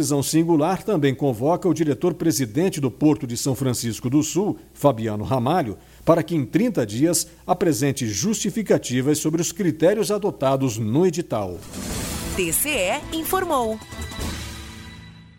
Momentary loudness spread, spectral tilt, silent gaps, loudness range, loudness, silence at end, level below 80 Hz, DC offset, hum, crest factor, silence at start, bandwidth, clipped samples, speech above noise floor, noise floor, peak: 10 LU; -5 dB/octave; none; 3 LU; -22 LUFS; 0.15 s; -44 dBFS; under 0.1%; none; 18 dB; 0 s; 17 kHz; under 0.1%; 21 dB; -42 dBFS; -4 dBFS